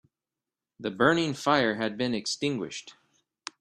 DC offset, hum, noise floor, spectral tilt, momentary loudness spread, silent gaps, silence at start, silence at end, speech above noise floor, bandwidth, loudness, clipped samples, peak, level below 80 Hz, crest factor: under 0.1%; none; -90 dBFS; -4.5 dB/octave; 16 LU; none; 0.8 s; 0.7 s; 63 dB; 14 kHz; -27 LUFS; under 0.1%; -8 dBFS; -68 dBFS; 22 dB